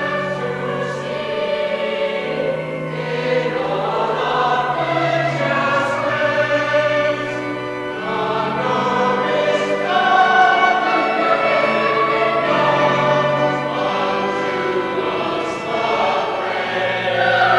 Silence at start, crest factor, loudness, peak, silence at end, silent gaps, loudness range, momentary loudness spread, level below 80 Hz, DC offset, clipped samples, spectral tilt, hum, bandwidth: 0 s; 16 dB; -18 LUFS; -2 dBFS; 0 s; none; 5 LU; 8 LU; -56 dBFS; under 0.1%; under 0.1%; -5 dB/octave; none; 11.5 kHz